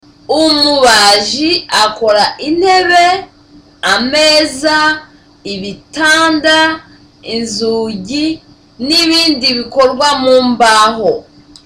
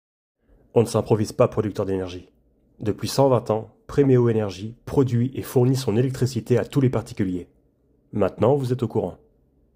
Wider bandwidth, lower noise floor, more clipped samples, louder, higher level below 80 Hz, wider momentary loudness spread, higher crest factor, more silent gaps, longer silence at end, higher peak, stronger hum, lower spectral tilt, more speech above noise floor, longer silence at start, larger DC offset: about the same, 17 kHz vs 16 kHz; second, -42 dBFS vs -62 dBFS; neither; first, -10 LUFS vs -23 LUFS; first, -44 dBFS vs -52 dBFS; first, 14 LU vs 10 LU; second, 12 dB vs 20 dB; neither; second, 0.45 s vs 0.6 s; first, 0 dBFS vs -4 dBFS; neither; second, -2 dB/octave vs -7.5 dB/octave; second, 31 dB vs 41 dB; second, 0.3 s vs 0.75 s; neither